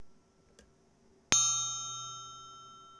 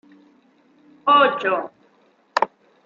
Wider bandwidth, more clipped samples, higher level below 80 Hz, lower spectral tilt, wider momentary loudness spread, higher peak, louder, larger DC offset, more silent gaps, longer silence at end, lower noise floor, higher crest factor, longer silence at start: first, 11 kHz vs 7.4 kHz; neither; first, -68 dBFS vs -76 dBFS; second, 0.5 dB/octave vs -4 dB/octave; first, 24 LU vs 12 LU; about the same, -4 dBFS vs -2 dBFS; second, -30 LUFS vs -20 LUFS; neither; neither; second, 0 s vs 0.4 s; first, -66 dBFS vs -59 dBFS; first, 34 dB vs 22 dB; second, 0 s vs 1.05 s